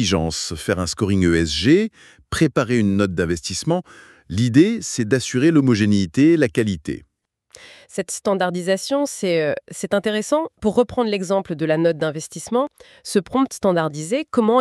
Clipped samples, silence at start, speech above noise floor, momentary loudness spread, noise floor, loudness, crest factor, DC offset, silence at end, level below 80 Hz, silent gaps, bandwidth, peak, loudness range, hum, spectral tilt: under 0.1%; 0 s; 32 dB; 9 LU; -51 dBFS; -20 LUFS; 16 dB; under 0.1%; 0 s; -46 dBFS; none; 13 kHz; -2 dBFS; 4 LU; none; -5.5 dB/octave